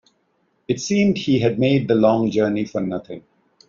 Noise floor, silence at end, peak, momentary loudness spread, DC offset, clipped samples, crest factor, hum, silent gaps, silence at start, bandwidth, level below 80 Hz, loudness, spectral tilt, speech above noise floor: -66 dBFS; 0.5 s; -4 dBFS; 11 LU; under 0.1%; under 0.1%; 16 dB; none; none; 0.7 s; 7.6 kHz; -56 dBFS; -19 LUFS; -6 dB/octave; 47 dB